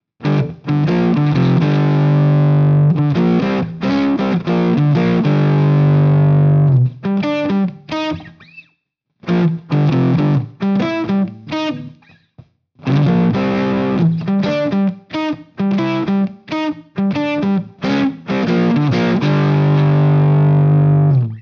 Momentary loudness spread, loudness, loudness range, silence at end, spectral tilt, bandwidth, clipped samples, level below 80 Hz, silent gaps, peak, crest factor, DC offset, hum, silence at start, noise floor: 9 LU; -15 LUFS; 5 LU; 0 s; -9 dB/octave; 6.2 kHz; under 0.1%; -50 dBFS; none; -2 dBFS; 12 dB; under 0.1%; none; 0.2 s; -68 dBFS